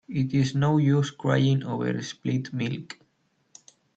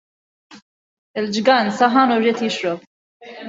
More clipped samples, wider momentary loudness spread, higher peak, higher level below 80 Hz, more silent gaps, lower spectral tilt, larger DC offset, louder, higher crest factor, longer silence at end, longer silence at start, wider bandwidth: neither; about the same, 10 LU vs 12 LU; second, -8 dBFS vs -2 dBFS; about the same, -62 dBFS vs -66 dBFS; second, none vs 0.62-1.14 s, 2.87-3.20 s; first, -7 dB/octave vs -4.5 dB/octave; neither; second, -25 LUFS vs -17 LUFS; about the same, 18 dB vs 18 dB; first, 1.05 s vs 0 s; second, 0.1 s vs 0.5 s; about the same, 8 kHz vs 7.8 kHz